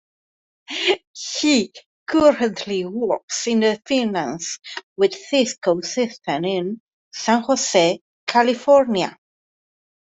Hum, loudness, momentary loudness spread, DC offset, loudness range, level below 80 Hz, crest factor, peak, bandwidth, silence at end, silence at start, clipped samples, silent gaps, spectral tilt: none; -20 LUFS; 12 LU; under 0.1%; 3 LU; -62 dBFS; 18 dB; -2 dBFS; 8.4 kHz; 0.9 s; 0.7 s; under 0.1%; 1.07-1.14 s, 1.86-2.06 s, 3.23-3.28 s, 4.83-4.96 s, 6.80-6.87 s, 6.93-7.11 s, 8.01-8.27 s; -3.5 dB/octave